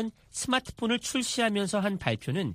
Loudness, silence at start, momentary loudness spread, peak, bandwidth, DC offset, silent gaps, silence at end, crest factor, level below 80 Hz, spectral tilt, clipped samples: -29 LUFS; 0 s; 4 LU; -10 dBFS; 15.5 kHz; under 0.1%; none; 0 s; 20 dB; -56 dBFS; -4 dB/octave; under 0.1%